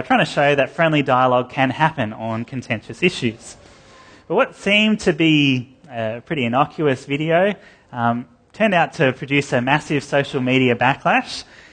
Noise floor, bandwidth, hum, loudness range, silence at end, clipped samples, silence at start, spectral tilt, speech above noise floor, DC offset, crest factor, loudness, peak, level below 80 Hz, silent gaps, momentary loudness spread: -46 dBFS; 9.6 kHz; none; 3 LU; 0.3 s; under 0.1%; 0 s; -5.5 dB/octave; 27 dB; under 0.1%; 18 dB; -18 LUFS; -2 dBFS; -54 dBFS; none; 11 LU